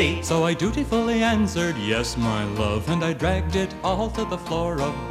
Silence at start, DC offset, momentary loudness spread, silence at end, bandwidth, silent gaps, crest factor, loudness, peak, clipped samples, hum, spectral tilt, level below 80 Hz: 0 s; under 0.1%; 5 LU; 0 s; 15 kHz; none; 16 dB; -23 LUFS; -6 dBFS; under 0.1%; none; -5.5 dB/octave; -36 dBFS